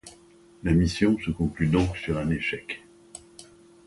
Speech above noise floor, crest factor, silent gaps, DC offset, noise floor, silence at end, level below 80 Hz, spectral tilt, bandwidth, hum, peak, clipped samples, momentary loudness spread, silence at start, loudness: 29 dB; 18 dB; none; under 0.1%; -54 dBFS; 0.45 s; -40 dBFS; -6.5 dB/octave; 11.5 kHz; none; -8 dBFS; under 0.1%; 21 LU; 0.05 s; -26 LUFS